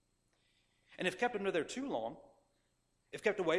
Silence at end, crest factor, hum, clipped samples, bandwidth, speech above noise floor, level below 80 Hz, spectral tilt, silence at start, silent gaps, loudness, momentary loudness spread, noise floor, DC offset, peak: 0 s; 22 dB; 60 Hz at -65 dBFS; under 0.1%; 14 kHz; 42 dB; -76 dBFS; -4.5 dB/octave; 0.9 s; none; -38 LUFS; 12 LU; -79 dBFS; under 0.1%; -18 dBFS